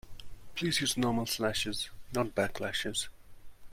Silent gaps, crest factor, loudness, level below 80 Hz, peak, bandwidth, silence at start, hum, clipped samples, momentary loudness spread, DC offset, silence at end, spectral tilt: none; 20 dB; -33 LUFS; -52 dBFS; -14 dBFS; 16.5 kHz; 0.05 s; none; under 0.1%; 13 LU; under 0.1%; 0 s; -3.5 dB/octave